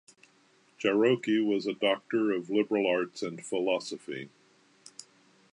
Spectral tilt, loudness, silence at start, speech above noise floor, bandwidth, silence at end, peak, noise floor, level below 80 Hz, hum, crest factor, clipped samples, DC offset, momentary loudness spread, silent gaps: -5 dB/octave; -29 LUFS; 0.8 s; 36 dB; 11 kHz; 0.5 s; -12 dBFS; -65 dBFS; -82 dBFS; none; 18 dB; under 0.1%; under 0.1%; 22 LU; none